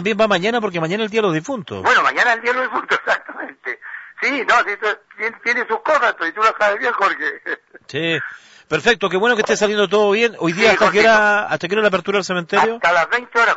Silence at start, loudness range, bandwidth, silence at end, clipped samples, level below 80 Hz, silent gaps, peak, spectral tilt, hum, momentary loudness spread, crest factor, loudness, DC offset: 0 s; 4 LU; 8 kHz; 0 s; under 0.1%; -58 dBFS; none; -4 dBFS; -4 dB/octave; none; 12 LU; 14 dB; -17 LUFS; under 0.1%